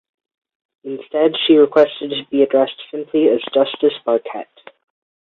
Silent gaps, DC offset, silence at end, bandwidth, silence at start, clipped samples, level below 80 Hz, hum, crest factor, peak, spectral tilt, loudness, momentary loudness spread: none; under 0.1%; 0.8 s; 4.7 kHz; 0.85 s; under 0.1%; -66 dBFS; none; 16 dB; -2 dBFS; -7 dB/octave; -16 LUFS; 18 LU